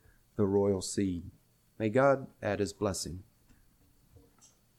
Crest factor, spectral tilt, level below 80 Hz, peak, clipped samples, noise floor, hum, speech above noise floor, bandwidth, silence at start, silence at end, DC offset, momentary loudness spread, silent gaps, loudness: 20 dB; -5.5 dB/octave; -60 dBFS; -14 dBFS; under 0.1%; -65 dBFS; none; 35 dB; 15.5 kHz; 0.35 s; 1.55 s; under 0.1%; 15 LU; none; -31 LUFS